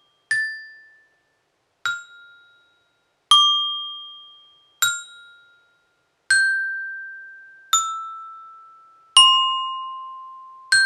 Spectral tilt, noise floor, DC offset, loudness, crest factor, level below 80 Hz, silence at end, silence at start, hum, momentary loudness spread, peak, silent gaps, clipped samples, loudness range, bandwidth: 4.5 dB/octave; -69 dBFS; under 0.1%; -19 LUFS; 24 dB; -82 dBFS; 0 s; 0.3 s; none; 26 LU; 0 dBFS; none; under 0.1%; 5 LU; 13.5 kHz